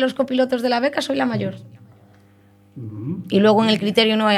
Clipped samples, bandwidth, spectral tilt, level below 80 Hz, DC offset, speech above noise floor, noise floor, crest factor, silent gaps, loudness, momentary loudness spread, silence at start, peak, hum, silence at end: under 0.1%; 14 kHz; -5.5 dB/octave; -66 dBFS; under 0.1%; 33 dB; -52 dBFS; 18 dB; none; -19 LUFS; 16 LU; 0 s; -2 dBFS; none; 0 s